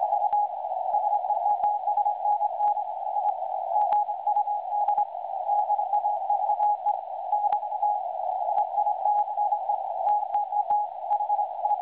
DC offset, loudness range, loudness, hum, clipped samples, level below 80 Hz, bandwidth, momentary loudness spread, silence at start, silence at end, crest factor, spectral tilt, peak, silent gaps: under 0.1%; 1 LU; -26 LUFS; none; under 0.1%; -78 dBFS; 4 kHz; 4 LU; 0 s; 0 s; 14 dB; -1.5 dB/octave; -12 dBFS; none